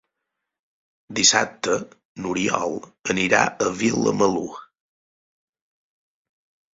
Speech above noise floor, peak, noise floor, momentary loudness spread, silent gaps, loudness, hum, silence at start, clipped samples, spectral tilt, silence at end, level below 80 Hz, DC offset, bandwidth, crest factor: 60 dB; -2 dBFS; -82 dBFS; 15 LU; 2.05-2.15 s; -21 LUFS; none; 1.1 s; under 0.1%; -2.5 dB/octave; 2.1 s; -60 dBFS; under 0.1%; 8 kHz; 24 dB